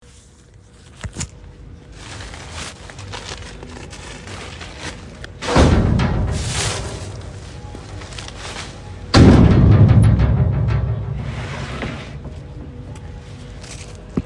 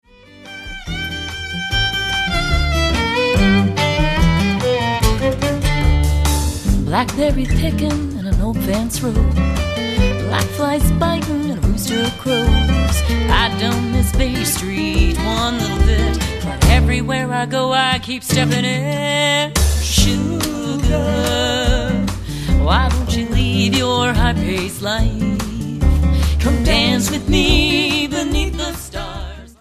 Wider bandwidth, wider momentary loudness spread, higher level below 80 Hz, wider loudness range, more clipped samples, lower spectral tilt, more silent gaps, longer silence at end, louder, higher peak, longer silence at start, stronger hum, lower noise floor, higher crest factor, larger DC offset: second, 11.5 kHz vs 14 kHz; first, 23 LU vs 6 LU; second, -28 dBFS vs -20 dBFS; first, 18 LU vs 2 LU; neither; first, -6.5 dB/octave vs -5 dB/octave; neither; about the same, 0 s vs 0.1 s; about the same, -16 LUFS vs -17 LUFS; about the same, 0 dBFS vs 0 dBFS; first, 1.05 s vs 0.35 s; neither; first, -45 dBFS vs -39 dBFS; about the same, 18 dB vs 16 dB; neither